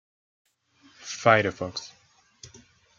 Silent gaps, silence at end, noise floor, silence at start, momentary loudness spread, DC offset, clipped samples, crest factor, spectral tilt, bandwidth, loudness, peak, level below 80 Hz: none; 0.5 s; -60 dBFS; 1 s; 23 LU; under 0.1%; under 0.1%; 26 dB; -4.5 dB/octave; 7.6 kHz; -24 LUFS; -4 dBFS; -68 dBFS